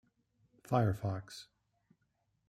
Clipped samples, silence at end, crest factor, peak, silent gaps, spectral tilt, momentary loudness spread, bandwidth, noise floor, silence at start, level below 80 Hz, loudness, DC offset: under 0.1%; 1.05 s; 22 dB; -16 dBFS; none; -7.5 dB/octave; 18 LU; 14 kHz; -80 dBFS; 0.7 s; -66 dBFS; -35 LUFS; under 0.1%